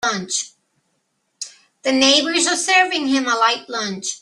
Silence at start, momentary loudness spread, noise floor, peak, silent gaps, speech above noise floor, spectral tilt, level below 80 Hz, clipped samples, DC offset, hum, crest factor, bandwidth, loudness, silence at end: 0 s; 20 LU; -70 dBFS; -2 dBFS; none; 51 dB; -1 dB/octave; -66 dBFS; under 0.1%; under 0.1%; none; 18 dB; 12.5 kHz; -17 LUFS; 0.05 s